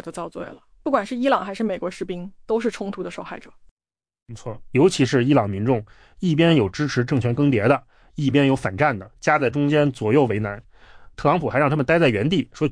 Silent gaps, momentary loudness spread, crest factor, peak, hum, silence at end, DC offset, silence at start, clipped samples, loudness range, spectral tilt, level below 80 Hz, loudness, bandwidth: 3.71-3.77 s, 4.22-4.26 s; 15 LU; 16 dB; -6 dBFS; none; 0 s; under 0.1%; 0.05 s; under 0.1%; 6 LU; -6.5 dB/octave; -50 dBFS; -21 LUFS; 10.5 kHz